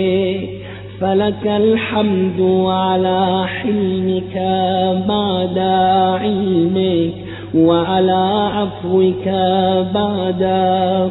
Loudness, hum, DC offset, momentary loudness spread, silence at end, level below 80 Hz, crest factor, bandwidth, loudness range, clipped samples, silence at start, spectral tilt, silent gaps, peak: -16 LUFS; none; under 0.1%; 6 LU; 0 s; -44 dBFS; 14 dB; 4.1 kHz; 1 LU; under 0.1%; 0 s; -12 dB/octave; none; -2 dBFS